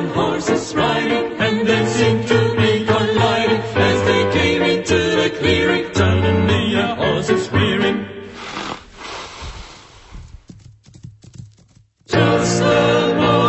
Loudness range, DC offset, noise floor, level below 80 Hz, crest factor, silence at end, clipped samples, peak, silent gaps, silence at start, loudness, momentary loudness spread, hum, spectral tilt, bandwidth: 16 LU; under 0.1%; -52 dBFS; -42 dBFS; 16 dB; 0 s; under 0.1%; -2 dBFS; none; 0 s; -16 LUFS; 14 LU; none; -5.5 dB/octave; 8.4 kHz